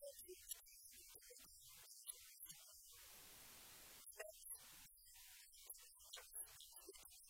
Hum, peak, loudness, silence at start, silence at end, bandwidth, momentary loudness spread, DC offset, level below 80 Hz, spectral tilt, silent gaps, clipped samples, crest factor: none; -34 dBFS; -58 LUFS; 0 s; 0 s; 16.5 kHz; 7 LU; under 0.1%; -80 dBFS; 0 dB/octave; none; under 0.1%; 26 dB